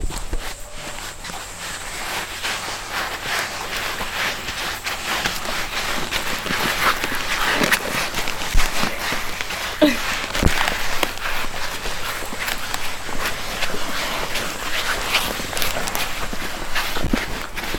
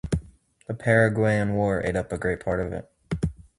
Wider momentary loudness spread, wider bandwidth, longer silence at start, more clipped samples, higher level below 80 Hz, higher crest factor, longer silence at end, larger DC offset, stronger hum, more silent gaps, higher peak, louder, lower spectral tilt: second, 9 LU vs 13 LU; first, 19 kHz vs 11.5 kHz; about the same, 0 s vs 0.05 s; neither; first, -30 dBFS vs -42 dBFS; about the same, 22 dB vs 18 dB; second, 0 s vs 0.25 s; neither; neither; neither; first, 0 dBFS vs -8 dBFS; about the same, -23 LUFS vs -25 LUFS; second, -2.5 dB/octave vs -7.5 dB/octave